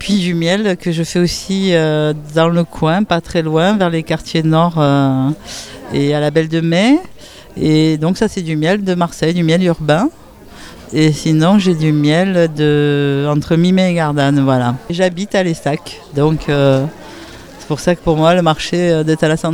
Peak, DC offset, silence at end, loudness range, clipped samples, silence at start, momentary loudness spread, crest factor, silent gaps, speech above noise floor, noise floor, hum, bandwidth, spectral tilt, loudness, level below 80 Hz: 0 dBFS; under 0.1%; 0 s; 2 LU; under 0.1%; 0 s; 7 LU; 14 dB; none; 22 dB; -36 dBFS; none; 14 kHz; -6.5 dB/octave; -14 LUFS; -40 dBFS